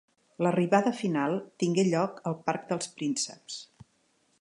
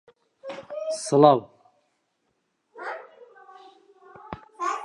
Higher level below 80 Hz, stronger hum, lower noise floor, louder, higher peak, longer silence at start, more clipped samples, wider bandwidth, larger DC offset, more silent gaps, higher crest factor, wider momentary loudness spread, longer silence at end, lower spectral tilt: second, -76 dBFS vs -68 dBFS; neither; second, -70 dBFS vs -74 dBFS; second, -29 LUFS vs -23 LUFS; second, -8 dBFS vs -2 dBFS; about the same, 0.4 s vs 0.45 s; neither; about the same, 11 kHz vs 11.5 kHz; neither; neither; about the same, 22 dB vs 26 dB; second, 9 LU vs 24 LU; first, 0.75 s vs 0 s; about the same, -5 dB/octave vs -5.5 dB/octave